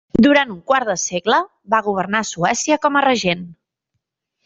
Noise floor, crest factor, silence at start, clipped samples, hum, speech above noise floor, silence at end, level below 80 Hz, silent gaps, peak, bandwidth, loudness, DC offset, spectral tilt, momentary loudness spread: -76 dBFS; 16 dB; 0.15 s; under 0.1%; none; 59 dB; 0.95 s; -50 dBFS; none; -2 dBFS; 8 kHz; -17 LUFS; under 0.1%; -3.5 dB/octave; 7 LU